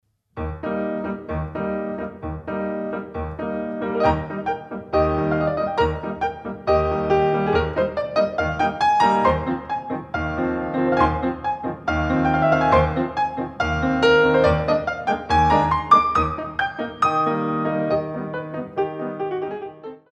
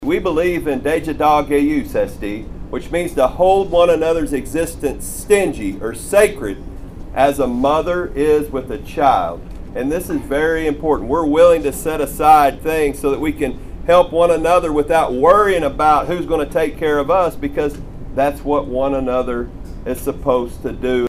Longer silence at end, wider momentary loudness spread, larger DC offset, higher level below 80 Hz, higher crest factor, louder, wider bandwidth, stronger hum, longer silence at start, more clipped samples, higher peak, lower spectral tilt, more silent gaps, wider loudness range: first, 0.15 s vs 0 s; about the same, 12 LU vs 14 LU; neither; second, -38 dBFS vs -32 dBFS; about the same, 18 dB vs 16 dB; second, -22 LUFS vs -17 LUFS; second, 9.6 kHz vs 15.5 kHz; neither; first, 0.35 s vs 0 s; neither; about the same, -2 dBFS vs 0 dBFS; first, -7 dB/octave vs -5.5 dB/octave; neither; first, 7 LU vs 4 LU